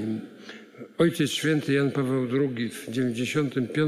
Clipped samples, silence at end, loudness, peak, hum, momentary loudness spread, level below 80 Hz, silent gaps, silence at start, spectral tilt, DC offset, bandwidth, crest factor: under 0.1%; 0 s; -26 LUFS; -10 dBFS; none; 18 LU; -72 dBFS; none; 0 s; -5.5 dB/octave; under 0.1%; 15.5 kHz; 16 dB